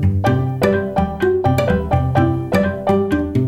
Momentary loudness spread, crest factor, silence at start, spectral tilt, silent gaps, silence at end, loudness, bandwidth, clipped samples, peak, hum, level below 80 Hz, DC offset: 2 LU; 14 dB; 0 s; -8 dB/octave; none; 0 s; -17 LUFS; 16 kHz; under 0.1%; -2 dBFS; none; -32 dBFS; under 0.1%